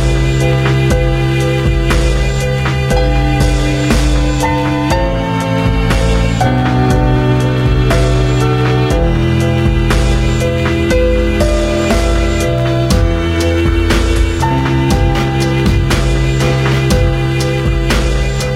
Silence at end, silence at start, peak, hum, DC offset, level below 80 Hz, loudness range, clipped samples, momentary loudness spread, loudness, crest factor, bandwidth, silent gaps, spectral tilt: 0 s; 0 s; 0 dBFS; none; under 0.1%; -16 dBFS; 1 LU; under 0.1%; 2 LU; -13 LUFS; 12 dB; 14.5 kHz; none; -6 dB/octave